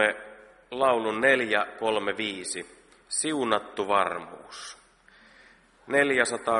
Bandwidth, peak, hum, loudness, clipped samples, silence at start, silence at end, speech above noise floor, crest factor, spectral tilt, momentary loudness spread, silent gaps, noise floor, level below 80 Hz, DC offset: 11.5 kHz; -6 dBFS; none; -26 LUFS; under 0.1%; 0 s; 0 s; 31 dB; 22 dB; -2.5 dB/octave; 18 LU; none; -57 dBFS; -68 dBFS; under 0.1%